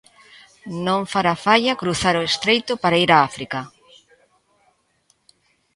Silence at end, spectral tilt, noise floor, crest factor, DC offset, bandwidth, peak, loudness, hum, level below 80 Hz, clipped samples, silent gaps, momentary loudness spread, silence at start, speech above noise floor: 2.1 s; -4 dB/octave; -64 dBFS; 22 dB; under 0.1%; 11.5 kHz; 0 dBFS; -19 LUFS; none; -54 dBFS; under 0.1%; none; 14 LU; 0.65 s; 45 dB